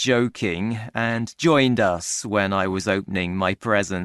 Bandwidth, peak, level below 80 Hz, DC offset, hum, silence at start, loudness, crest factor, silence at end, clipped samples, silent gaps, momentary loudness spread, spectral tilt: 12.5 kHz; -4 dBFS; -54 dBFS; under 0.1%; none; 0 s; -22 LUFS; 18 dB; 0 s; under 0.1%; none; 7 LU; -4.5 dB/octave